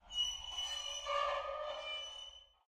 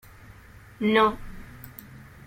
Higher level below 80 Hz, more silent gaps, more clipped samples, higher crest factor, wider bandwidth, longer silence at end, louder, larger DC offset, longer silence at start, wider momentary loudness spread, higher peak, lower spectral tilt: second, -64 dBFS vs -48 dBFS; neither; neither; about the same, 16 dB vs 20 dB; about the same, 15.5 kHz vs 16.5 kHz; about the same, 0.2 s vs 0.25 s; second, -40 LUFS vs -23 LUFS; neither; second, 0.05 s vs 0.8 s; second, 9 LU vs 24 LU; second, -24 dBFS vs -8 dBFS; second, 1 dB/octave vs -6 dB/octave